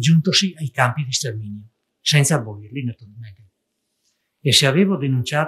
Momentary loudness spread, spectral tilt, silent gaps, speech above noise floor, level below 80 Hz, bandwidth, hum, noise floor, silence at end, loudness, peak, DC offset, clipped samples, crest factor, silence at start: 17 LU; -4 dB/octave; none; 55 dB; -64 dBFS; 15 kHz; none; -74 dBFS; 0 s; -18 LUFS; 0 dBFS; under 0.1%; under 0.1%; 20 dB; 0 s